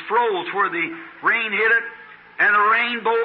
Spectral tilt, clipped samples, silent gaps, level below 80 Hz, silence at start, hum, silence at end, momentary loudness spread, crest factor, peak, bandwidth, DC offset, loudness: -8 dB/octave; under 0.1%; none; -74 dBFS; 0 s; none; 0 s; 8 LU; 12 dB; -8 dBFS; 5.6 kHz; under 0.1%; -19 LUFS